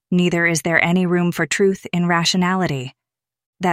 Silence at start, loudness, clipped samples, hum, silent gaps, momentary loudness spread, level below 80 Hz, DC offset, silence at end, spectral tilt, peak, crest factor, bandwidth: 0.1 s; -18 LUFS; under 0.1%; none; 3.46-3.53 s; 8 LU; -56 dBFS; under 0.1%; 0 s; -5 dB/octave; -2 dBFS; 16 dB; 15.5 kHz